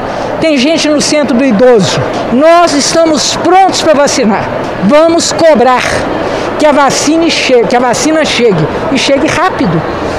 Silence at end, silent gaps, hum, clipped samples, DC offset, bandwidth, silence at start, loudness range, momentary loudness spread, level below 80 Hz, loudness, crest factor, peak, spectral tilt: 0 s; none; none; 0.2%; under 0.1%; 15 kHz; 0 s; 1 LU; 6 LU; -34 dBFS; -8 LUFS; 8 dB; 0 dBFS; -4 dB/octave